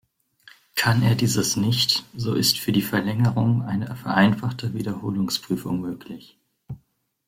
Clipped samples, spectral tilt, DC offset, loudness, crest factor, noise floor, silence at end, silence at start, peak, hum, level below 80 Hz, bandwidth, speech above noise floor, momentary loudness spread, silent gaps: under 0.1%; -4.5 dB/octave; under 0.1%; -22 LUFS; 18 dB; -66 dBFS; 0.5 s; 0.75 s; -6 dBFS; none; -54 dBFS; 16.5 kHz; 43 dB; 17 LU; none